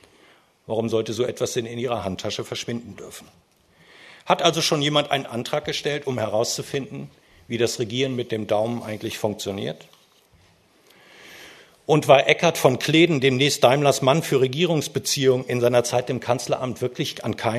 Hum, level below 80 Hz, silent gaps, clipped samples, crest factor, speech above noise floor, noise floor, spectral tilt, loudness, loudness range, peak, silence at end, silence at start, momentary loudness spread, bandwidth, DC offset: none; -62 dBFS; none; under 0.1%; 22 dB; 36 dB; -58 dBFS; -4.5 dB/octave; -22 LUFS; 10 LU; 0 dBFS; 0 s; 0.7 s; 15 LU; 13.5 kHz; under 0.1%